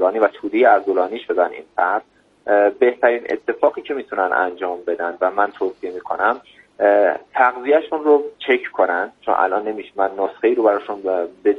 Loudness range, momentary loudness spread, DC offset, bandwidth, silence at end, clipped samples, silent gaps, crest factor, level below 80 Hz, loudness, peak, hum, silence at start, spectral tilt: 3 LU; 9 LU; under 0.1%; 5.2 kHz; 0 s; under 0.1%; none; 18 dB; -68 dBFS; -19 LUFS; 0 dBFS; none; 0 s; -6 dB/octave